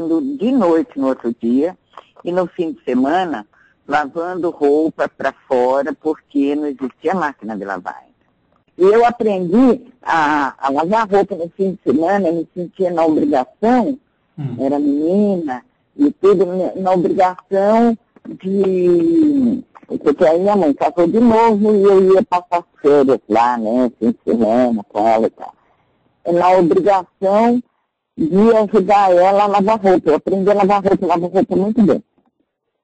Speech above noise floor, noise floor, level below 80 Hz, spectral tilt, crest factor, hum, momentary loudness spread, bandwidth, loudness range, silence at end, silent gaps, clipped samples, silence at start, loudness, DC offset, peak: 54 dB; -69 dBFS; -52 dBFS; -7.5 dB/octave; 10 dB; none; 10 LU; 8.6 kHz; 5 LU; 0.85 s; none; under 0.1%; 0 s; -15 LUFS; under 0.1%; -4 dBFS